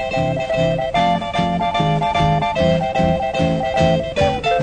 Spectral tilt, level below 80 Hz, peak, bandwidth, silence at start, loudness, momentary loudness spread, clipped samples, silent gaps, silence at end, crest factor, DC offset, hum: -6.5 dB/octave; -36 dBFS; -2 dBFS; 9.4 kHz; 0 s; -18 LUFS; 2 LU; under 0.1%; none; 0 s; 16 dB; under 0.1%; none